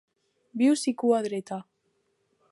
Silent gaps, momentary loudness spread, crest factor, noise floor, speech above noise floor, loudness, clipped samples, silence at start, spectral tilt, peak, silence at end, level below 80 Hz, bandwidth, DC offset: none; 15 LU; 18 dB; -73 dBFS; 48 dB; -26 LUFS; under 0.1%; 0.55 s; -4.5 dB/octave; -10 dBFS; 0.9 s; -82 dBFS; 11.5 kHz; under 0.1%